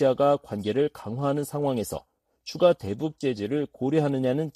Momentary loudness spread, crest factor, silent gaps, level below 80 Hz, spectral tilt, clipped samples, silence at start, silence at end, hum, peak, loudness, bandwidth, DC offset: 9 LU; 18 dB; none; -60 dBFS; -6.5 dB/octave; under 0.1%; 0 s; 0.05 s; none; -8 dBFS; -26 LUFS; 14.5 kHz; under 0.1%